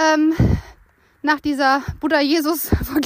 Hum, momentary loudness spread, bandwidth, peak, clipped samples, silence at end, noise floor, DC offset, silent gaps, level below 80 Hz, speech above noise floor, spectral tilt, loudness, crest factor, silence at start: none; 5 LU; 15.5 kHz; -4 dBFS; under 0.1%; 0 s; -54 dBFS; under 0.1%; none; -32 dBFS; 36 dB; -5.5 dB/octave; -19 LUFS; 16 dB; 0 s